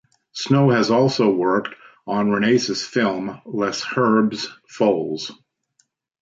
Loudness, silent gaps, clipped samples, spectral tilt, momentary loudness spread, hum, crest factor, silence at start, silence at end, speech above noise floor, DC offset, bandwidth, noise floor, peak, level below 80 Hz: -20 LUFS; none; under 0.1%; -5.5 dB/octave; 13 LU; none; 16 dB; 0.35 s; 0.9 s; 47 dB; under 0.1%; 7.8 kHz; -66 dBFS; -4 dBFS; -64 dBFS